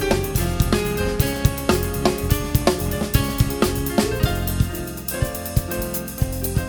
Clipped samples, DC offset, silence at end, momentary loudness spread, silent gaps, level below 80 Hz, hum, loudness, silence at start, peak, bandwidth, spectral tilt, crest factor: under 0.1%; under 0.1%; 0 s; 5 LU; none; -28 dBFS; none; -22 LUFS; 0 s; 0 dBFS; over 20 kHz; -5 dB/octave; 20 dB